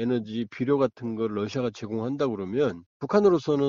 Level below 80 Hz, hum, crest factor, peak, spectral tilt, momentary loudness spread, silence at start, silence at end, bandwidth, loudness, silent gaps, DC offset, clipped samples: -62 dBFS; none; 16 dB; -8 dBFS; -6.5 dB/octave; 9 LU; 0 s; 0 s; 7.4 kHz; -27 LUFS; 2.86-3.00 s; under 0.1%; under 0.1%